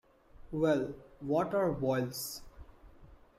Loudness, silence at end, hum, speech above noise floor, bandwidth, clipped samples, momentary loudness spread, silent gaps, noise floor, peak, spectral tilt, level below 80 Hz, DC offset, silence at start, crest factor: -33 LUFS; 0.2 s; none; 25 dB; 16 kHz; under 0.1%; 12 LU; none; -57 dBFS; -18 dBFS; -6 dB/octave; -58 dBFS; under 0.1%; 0.35 s; 16 dB